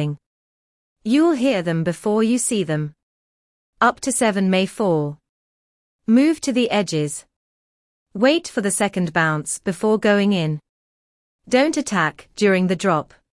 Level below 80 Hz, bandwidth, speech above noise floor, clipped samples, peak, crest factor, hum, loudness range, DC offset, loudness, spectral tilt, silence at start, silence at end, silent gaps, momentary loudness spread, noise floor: -60 dBFS; 12 kHz; over 71 dB; under 0.1%; -4 dBFS; 18 dB; none; 2 LU; under 0.1%; -19 LUFS; -5 dB/octave; 0 s; 0.35 s; 0.26-0.96 s, 3.03-3.73 s, 5.29-5.99 s, 7.36-8.06 s, 10.69-11.39 s; 9 LU; under -90 dBFS